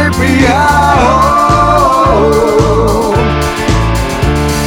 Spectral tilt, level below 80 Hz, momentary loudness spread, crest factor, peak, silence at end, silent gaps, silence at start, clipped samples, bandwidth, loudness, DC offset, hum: -5.5 dB/octave; -20 dBFS; 5 LU; 8 dB; 0 dBFS; 0 s; none; 0 s; under 0.1%; 20 kHz; -9 LUFS; under 0.1%; none